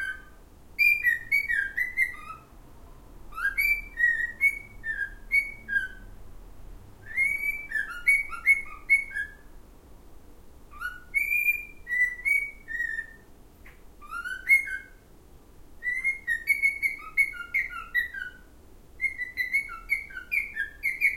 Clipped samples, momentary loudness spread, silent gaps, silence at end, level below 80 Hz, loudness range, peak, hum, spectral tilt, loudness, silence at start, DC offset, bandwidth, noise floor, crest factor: under 0.1%; 14 LU; none; 0 s; -50 dBFS; 4 LU; -10 dBFS; none; -1.5 dB/octave; -26 LUFS; 0 s; under 0.1%; 16 kHz; -52 dBFS; 20 dB